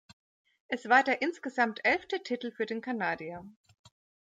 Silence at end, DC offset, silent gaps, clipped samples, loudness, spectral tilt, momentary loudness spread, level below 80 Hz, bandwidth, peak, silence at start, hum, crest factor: 0.75 s; under 0.1%; none; under 0.1%; -30 LUFS; -4.5 dB/octave; 13 LU; -74 dBFS; 9 kHz; -12 dBFS; 0.7 s; none; 20 dB